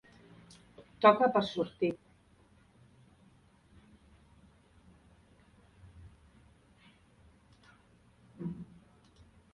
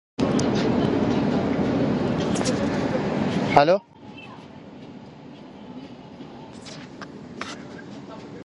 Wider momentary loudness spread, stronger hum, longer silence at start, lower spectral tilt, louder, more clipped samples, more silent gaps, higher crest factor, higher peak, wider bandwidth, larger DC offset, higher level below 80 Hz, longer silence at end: first, 32 LU vs 21 LU; neither; first, 1 s vs 0.2 s; about the same, -6.5 dB/octave vs -6 dB/octave; second, -30 LUFS vs -23 LUFS; neither; neither; about the same, 28 dB vs 24 dB; second, -10 dBFS vs 0 dBFS; about the same, 11 kHz vs 11.5 kHz; neither; second, -66 dBFS vs -48 dBFS; first, 0.9 s vs 0 s